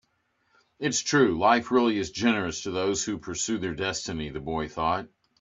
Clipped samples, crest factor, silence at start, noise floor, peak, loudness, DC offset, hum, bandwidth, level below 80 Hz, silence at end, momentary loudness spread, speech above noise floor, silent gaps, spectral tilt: under 0.1%; 22 dB; 0.8 s; -72 dBFS; -6 dBFS; -26 LUFS; under 0.1%; none; 8 kHz; -54 dBFS; 0.35 s; 10 LU; 45 dB; none; -3.5 dB/octave